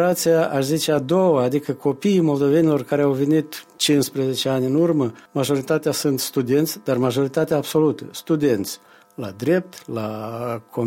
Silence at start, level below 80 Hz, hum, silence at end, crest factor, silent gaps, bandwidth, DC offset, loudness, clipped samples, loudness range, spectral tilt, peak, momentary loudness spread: 0 s; -62 dBFS; none; 0 s; 14 dB; none; 16.5 kHz; under 0.1%; -20 LUFS; under 0.1%; 3 LU; -5.5 dB/octave; -6 dBFS; 10 LU